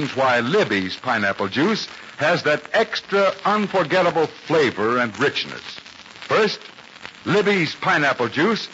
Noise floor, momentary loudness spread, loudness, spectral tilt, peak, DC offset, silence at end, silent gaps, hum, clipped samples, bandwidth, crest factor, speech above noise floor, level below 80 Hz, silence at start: -41 dBFS; 14 LU; -20 LUFS; -3 dB/octave; -6 dBFS; under 0.1%; 0 s; none; none; under 0.1%; 8 kHz; 14 dB; 20 dB; -64 dBFS; 0 s